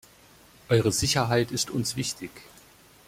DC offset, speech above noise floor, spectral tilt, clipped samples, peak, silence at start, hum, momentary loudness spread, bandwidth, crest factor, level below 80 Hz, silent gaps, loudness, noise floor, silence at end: under 0.1%; 29 dB; -4 dB/octave; under 0.1%; -8 dBFS; 0.7 s; none; 10 LU; 16.5 kHz; 20 dB; -52 dBFS; none; -25 LUFS; -55 dBFS; 0.65 s